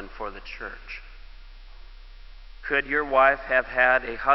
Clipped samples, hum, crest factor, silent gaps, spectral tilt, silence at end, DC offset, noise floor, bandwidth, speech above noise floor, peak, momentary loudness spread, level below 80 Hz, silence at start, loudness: under 0.1%; none; 20 dB; none; -6 dB/octave; 0 s; under 0.1%; -43 dBFS; 6 kHz; 20 dB; -4 dBFS; 19 LU; -44 dBFS; 0 s; -22 LUFS